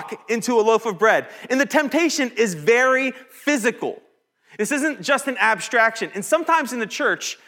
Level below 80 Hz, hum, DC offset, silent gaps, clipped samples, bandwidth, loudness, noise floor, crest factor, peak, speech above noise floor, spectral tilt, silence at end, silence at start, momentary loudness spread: -80 dBFS; none; under 0.1%; none; under 0.1%; 18 kHz; -20 LUFS; -54 dBFS; 18 dB; -4 dBFS; 33 dB; -3 dB/octave; 0.15 s; 0 s; 8 LU